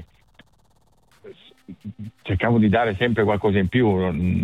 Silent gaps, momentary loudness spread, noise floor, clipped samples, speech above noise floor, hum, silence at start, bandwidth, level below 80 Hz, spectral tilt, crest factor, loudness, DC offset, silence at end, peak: none; 19 LU; -61 dBFS; under 0.1%; 41 dB; none; 0 s; 5.2 kHz; -44 dBFS; -9 dB/octave; 16 dB; -20 LUFS; under 0.1%; 0 s; -6 dBFS